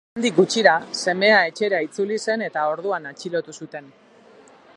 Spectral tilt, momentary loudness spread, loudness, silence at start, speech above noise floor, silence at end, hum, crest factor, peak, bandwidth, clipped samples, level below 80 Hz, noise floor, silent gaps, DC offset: -3.5 dB/octave; 14 LU; -20 LUFS; 0.15 s; 29 dB; 0.9 s; none; 20 dB; -2 dBFS; 11 kHz; under 0.1%; -72 dBFS; -50 dBFS; none; under 0.1%